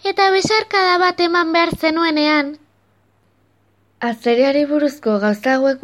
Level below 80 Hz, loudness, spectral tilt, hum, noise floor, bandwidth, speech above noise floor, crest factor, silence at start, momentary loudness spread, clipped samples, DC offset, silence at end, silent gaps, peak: -54 dBFS; -16 LUFS; -4 dB/octave; none; -59 dBFS; 15.5 kHz; 43 dB; 16 dB; 0.05 s; 4 LU; under 0.1%; under 0.1%; 0.05 s; none; -2 dBFS